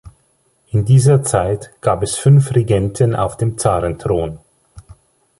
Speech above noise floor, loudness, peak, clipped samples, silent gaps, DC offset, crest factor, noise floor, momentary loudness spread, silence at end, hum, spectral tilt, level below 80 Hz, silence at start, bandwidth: 46 dB; -15 LUFS; -2 dBFS; under 0.1%; none; under 0.1%; 14 dB; -60 dBFS; 9 LU; 0.6 s; none; -6.5 dB/octave; -38 dBFS; 0.05 s; 11.5 kHz